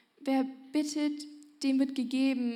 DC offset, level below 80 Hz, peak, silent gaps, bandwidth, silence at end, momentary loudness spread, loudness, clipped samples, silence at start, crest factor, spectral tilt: under 0.1%; under -90 dBFS; -18 dBFS; none; 13.5 kHz; 0 s; 6 LU; -31 LUFS; under 0.1%; 0.2 s; 12 dB; -3.5 dB/octave